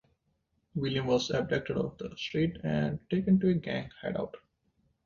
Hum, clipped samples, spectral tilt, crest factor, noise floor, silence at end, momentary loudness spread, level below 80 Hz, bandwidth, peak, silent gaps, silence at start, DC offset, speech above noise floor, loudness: none; under 0.1%; -6.5 dB/octave; 16 dB; -76 dBFS; 0.65 s; 11 LU; -58 dBFS; 7.2 kHz; -16 dBFS; none; 0.75 s; under 0.1%; 46 dB; -31 LUFS